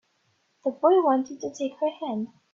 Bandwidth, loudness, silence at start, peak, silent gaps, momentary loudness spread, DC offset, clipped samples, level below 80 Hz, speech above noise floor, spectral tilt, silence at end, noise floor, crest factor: 7.4 kHz; -26 LUFS; 0.65 s; -8 dBFS; none; 12 LU; under 0.1%; under 0.1%; -78 dBFS; 45 dB; -5.5 dB/octave; 0.3 s; -70 dBFS; 18 dB